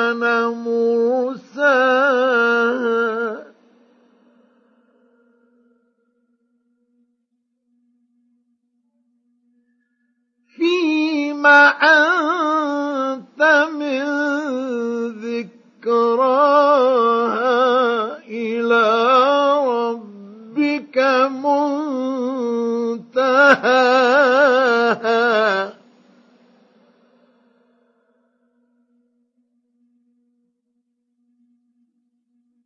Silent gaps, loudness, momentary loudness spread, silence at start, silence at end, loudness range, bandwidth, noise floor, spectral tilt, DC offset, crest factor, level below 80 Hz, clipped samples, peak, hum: none; -17 LUFS; 12 LU; 0 s; 6.95 s; 8 LU; 7.2 kHz; -72 dBFS; -4 dB/octave; under 0.1%; 18 dB; -84 dBFS; under 0.1%; 0 dBFS; none